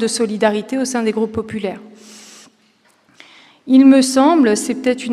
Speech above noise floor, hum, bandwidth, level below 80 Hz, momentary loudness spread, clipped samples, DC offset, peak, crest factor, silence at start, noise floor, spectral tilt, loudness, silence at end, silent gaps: 41 dB; none; 13 kHz; -60 dBFS; 14 LU; under 0.1%; under 0.1%; 0 dBFS; 16 dB; 0 s; -56 dBFS; -4 dB/octave; -15 LUFS; 0 s; none